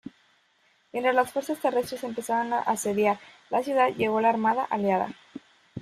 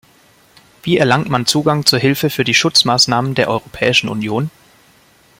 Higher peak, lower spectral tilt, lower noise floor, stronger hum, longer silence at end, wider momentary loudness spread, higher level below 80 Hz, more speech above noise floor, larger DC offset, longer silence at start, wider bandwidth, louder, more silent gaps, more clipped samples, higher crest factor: second, -8 dBFS vs 0 dBFS; about the same, -4.5 dB/octave vs -4 dB/octave; first, -66 dBFS vs -50 dBFS; neither; second, 0 s vs 0.9 s; first, 14 LU vs 9 LU; second, -68 dBFS vs -50 dBFS; first, 40 dB vs 35 dB; neither; second, 0.05 s vs 0.85 s; about the same, 15.5 kHz vs 16.5 kHz; second, -26 LUFS vs -14 LUFS; neither; neither; about the same, 18 dB vs 16 dB